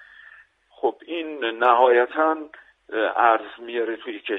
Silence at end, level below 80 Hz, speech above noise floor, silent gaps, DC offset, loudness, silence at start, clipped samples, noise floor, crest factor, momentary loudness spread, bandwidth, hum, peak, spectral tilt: 0 s; -72 dBFS; 31 dB; none; under 0.1%; -22 LUFS; 0.85 s; under 0.1%; -52 dBFS; 20 dB; 14 LU; 4 kHz; none; -2 dBFS; -5 dB/octave